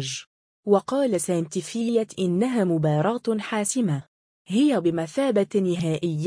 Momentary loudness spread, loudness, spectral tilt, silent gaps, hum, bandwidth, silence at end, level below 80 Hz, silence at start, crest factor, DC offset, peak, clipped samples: 6 LU; -24 LUFS; -6 dB/octave; 0.27-0.63 s, 4.08-4.45 s; none; 10.5 kHz; 0 s; -66 dBFS; 0 s; 16 dB; under 0.1%; -6 dBFS; under 0.1%